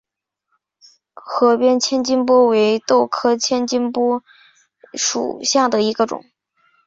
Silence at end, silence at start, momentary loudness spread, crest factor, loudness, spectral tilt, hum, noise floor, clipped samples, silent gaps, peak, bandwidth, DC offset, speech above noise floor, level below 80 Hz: 0.7 s; 1.25 s; 8 LU; 16 dB; -17 LUFS; -3 dB/octave; none; -76 dBFS; under 0.1%; none; -2 dBFS; 7.8 kHz; under 0.1%; 60 dB; -64 dBFS